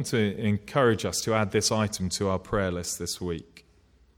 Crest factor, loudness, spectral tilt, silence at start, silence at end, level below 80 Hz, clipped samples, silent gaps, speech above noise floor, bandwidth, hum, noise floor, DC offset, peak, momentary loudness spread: 18 dB; -27 LUFS; -4.5 dB/octave; 0 s; 0.6 s; -52 dBFS; under 0.1%; none; 33 dB; 17.5 kHz; none; -60 dBFS; under 0.1%; -10 dBFS; 7 LU